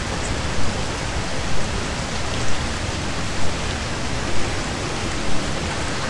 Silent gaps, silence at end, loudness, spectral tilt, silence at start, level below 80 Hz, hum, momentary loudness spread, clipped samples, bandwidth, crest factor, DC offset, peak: none; 0 s; -25 LUFS; -4 dB/octave; 0 s; -32 dBFS; none; 1 LU; under 0.1%; 11.5 kHz; 14 dB; 4%; -6 dBFS